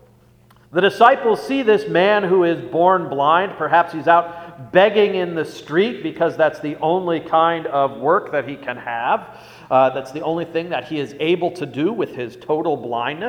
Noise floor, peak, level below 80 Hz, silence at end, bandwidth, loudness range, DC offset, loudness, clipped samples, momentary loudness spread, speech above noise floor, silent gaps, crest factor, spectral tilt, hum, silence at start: -51 dBFS; 0 dBFS; -62 dBFS; 0 s; 15.5 kHz; 5 LU; under 0.1%; -18 LUFS; under 0.1%; 10 LU; 33 dB; none; 18 dB; -6.5 dB/octave; none; 0.75 s